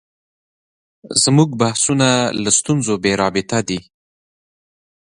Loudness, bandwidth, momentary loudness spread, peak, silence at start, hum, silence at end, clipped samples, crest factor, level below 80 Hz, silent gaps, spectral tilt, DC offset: -16 LUFS; 11.5 kHz; 7 LU; 0 dBFS; 1.05 s; none; 1.25 s; under 0.1%; 18 dB; -52 dBFS; none; -4 dB/octave; under 0.1%